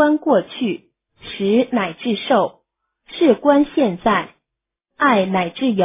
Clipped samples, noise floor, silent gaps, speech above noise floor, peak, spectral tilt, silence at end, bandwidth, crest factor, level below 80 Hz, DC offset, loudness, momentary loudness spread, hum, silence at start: under 0.1%; -82 dBFS; none; 65 dB; -2 dBFS; -10 dB/octave; 0 s; 3.9 kHz; 16 dB; -56 dBFS; under 0.1%; -18 LUFS; 12 LU; none; 0 s